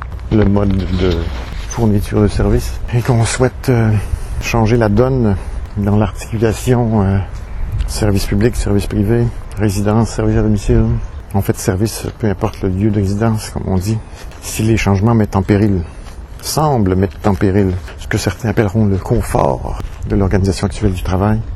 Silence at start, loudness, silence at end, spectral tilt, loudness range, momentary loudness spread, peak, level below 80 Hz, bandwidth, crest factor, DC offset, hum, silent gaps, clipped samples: 0 s; -15 LUFS; 0 s; -6.5 dB/octave; 2 LU; 9 LU; 0 dBFS; -24 dBFS; 13.5 kHz; 14 dB; under 0.1%; none; none; under 0.1%